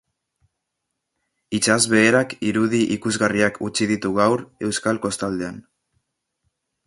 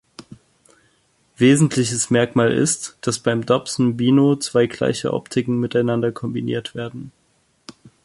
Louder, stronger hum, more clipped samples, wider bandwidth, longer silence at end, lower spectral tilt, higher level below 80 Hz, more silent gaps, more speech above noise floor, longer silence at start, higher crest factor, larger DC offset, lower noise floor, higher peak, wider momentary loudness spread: about the same, -20 LUFS vs -19 LUFS; neither; neither; about the same, 11.5 kHz vs 11.5 kHz; first, 1.25 s vs 0.15 s; about the same, -4 dB/octave vs -5 dB/octave; about the same, -56 dBFS vs -56 dBFS; neither; first, 59 dB vs 44 dB; first, 1.5 s vs 0.2 s; about the same, 20 dB vs 18 dB; neither; first, -79 dBFS vs -63 dBFS; about the same, -2 dBFS vs -2 dBFS; about the same, 10 LU vs 10 LU